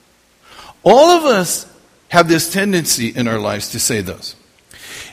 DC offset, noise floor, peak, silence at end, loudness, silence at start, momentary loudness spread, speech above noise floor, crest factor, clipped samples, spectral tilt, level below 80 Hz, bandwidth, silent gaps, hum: under 0.1%; -51 dBFS; 0 dBFS; 0 s; -14 LUFS; 0.6 s; 18 LU; 37 dB; 16 dB; under 0.1%; -3.5 dB/octave; -50 dBFS; 15.5 kHz; none; none